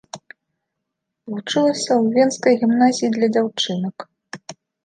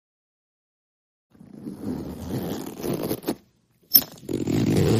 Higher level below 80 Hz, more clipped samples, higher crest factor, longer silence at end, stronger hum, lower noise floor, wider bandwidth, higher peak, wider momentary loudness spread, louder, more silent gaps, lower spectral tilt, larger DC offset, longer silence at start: second, -72 dBFS vs -52 dBFS; neither; second, 18 dB vs 26 dB; first, 0.3 s vs 0 s; neither; first, -79 dBFS vs -62 dBFS; second, 9.6 kHz vs 15.5 kHz; about the same, -2 dBFS vs 0 dBFS; first, 21 LU vs 17 LU; first, -18 LUFS vs -25 LUFS; neither; about the same, -4.5 dB/octave vs -5 dB/octave; neither; second, 0.15 s vs 1.55 s